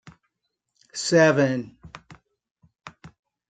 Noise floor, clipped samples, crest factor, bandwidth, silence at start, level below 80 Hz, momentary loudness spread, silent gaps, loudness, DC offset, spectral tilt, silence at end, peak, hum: -79 dBFS; under 0.1%; 22 dB; 9.4 kHz; 0.05 s; -64 dBFS; 27 LU; 2.51-2.55 s; -21 LUFS; under 0.1%; -5 dB/octave; 0.4 s; -4 dBFS; none